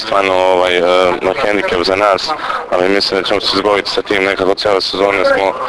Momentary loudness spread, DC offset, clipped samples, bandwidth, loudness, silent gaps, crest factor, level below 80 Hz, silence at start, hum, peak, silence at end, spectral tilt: 3 LU; under 0.1%; 0.2%; 11 kHz; -13 LUFS; none; 12 dB; -44 dBFS; 0 s; none; 0 dBFS; 0 s; -3.5 dB/octave